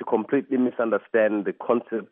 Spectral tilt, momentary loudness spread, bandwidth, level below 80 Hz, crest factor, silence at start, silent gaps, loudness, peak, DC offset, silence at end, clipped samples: -5.5 dB/octave; 4 LU; 3.7 kHz; -80 dBFS; 16 dB; 0 s; none; -24 LUFS; -8 dBFS; under 0.1%; 0.05 s; under 0.1%